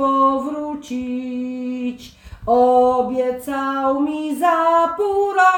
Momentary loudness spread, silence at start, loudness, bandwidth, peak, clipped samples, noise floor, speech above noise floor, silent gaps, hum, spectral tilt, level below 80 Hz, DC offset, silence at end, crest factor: 12 LU; 0 s; -19 LUFS; 20 kHz; -2 dBFS; under 0.1%; -39 dBFS; 22 dB; none; none; -5 dB/octave; -50 dBFS; under 0.1%; 0 s; 16 dB